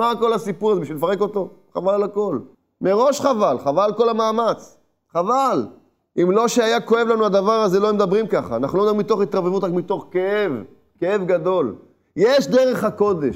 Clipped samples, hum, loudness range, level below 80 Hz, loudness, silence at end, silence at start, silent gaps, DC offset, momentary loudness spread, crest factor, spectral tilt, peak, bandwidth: under 0.1%; none; 3 LU; -62 dBFS; -19 LUFS; 0 s; 0 s; none; under 0.1%; 8 LU; 16 dB; -5.5 dB/octave; -4 dBFS; 16 kHz